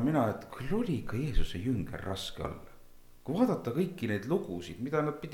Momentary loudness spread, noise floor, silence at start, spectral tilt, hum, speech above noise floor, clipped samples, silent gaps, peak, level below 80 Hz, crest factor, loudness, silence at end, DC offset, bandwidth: 11 LU; -52 dBFS; 0 s; -7 dB/octave; none; 21 dB; under 0.1%; none; -14 dBFS; -42 dBFS; 18 dB; -34 LUFS; 0 s; under 0.1%; 16.5 kHz